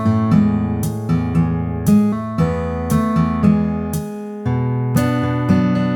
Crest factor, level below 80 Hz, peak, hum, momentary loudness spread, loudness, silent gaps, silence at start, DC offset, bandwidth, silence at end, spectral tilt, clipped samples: 14 dB; -36 dBFS; -2 dBFS; none; 7 LU; -18 LUFS; none; 0 s; under 0.1%; 19 kHz; 0 s; -8 dB/octave; under 0.1%